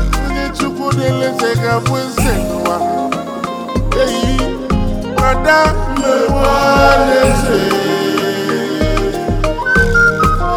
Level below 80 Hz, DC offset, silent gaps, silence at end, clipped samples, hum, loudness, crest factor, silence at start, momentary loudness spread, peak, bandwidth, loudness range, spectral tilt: -22 dBFS; under 0.1%; none; 0 s; under 0.1%; none; -14 LUFS; 14 dB; 0 s; 8 LU; 0 dBFS; 18.5 kHz; 4 LU; -5 dB/octave